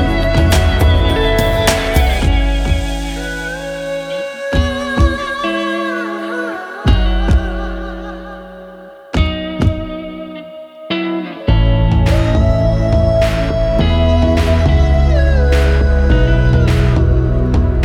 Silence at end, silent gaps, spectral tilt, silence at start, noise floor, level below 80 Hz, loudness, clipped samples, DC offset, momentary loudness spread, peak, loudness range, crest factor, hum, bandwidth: 0 s; none; -6.5 dB/octave; 0 s; -35 dBFS; -16 dBFS; -15 LUFS; under 0.1%; under 0.1%; 12 LU; -2 dBFS; 7 LU; 12 dB; none; 17 kHz